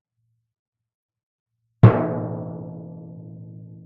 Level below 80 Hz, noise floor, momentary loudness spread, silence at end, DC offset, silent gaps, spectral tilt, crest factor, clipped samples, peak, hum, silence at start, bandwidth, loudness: -48 dBFS; -40 dBFS; 25 LU; 0.2 s; under 0.1%; none; -9.5 dB/octave; 24 dB; under 0.1%; 0 dBFS; none; 1.85 s; 4 kHz; -19 LUFS